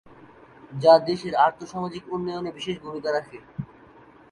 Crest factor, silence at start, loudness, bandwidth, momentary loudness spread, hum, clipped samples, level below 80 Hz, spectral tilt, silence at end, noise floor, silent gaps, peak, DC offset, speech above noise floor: 20 dB; 0.7 s; -24 LUFS; 10 kHz; 21 LU; none; under 0.1%; -62 dBFS; -6 dB/octave; 0.65 s; -51 dBFS; none; -4 dBFS; under 0.1%; 28 dB